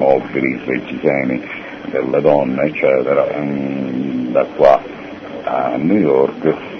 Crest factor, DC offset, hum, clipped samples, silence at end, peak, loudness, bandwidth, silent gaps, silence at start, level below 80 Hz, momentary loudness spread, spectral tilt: 16 dB; under 0.1%; none; under 0.1%; 0 s; 0 dBFS; -16 LUFS; 6.4 kHz; none; 0 s; -52 dBFS; 11 LU; -8.5 dB/octave